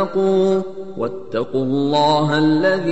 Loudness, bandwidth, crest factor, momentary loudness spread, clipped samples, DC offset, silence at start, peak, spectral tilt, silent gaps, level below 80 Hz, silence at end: -18 LUFS; 8.2 kHz; 14 dB; 10 LU; under 0.1%; 2%; 0 s; -4 dBFS; -6.5 dB/octave; none; -58 dBFS; 0 s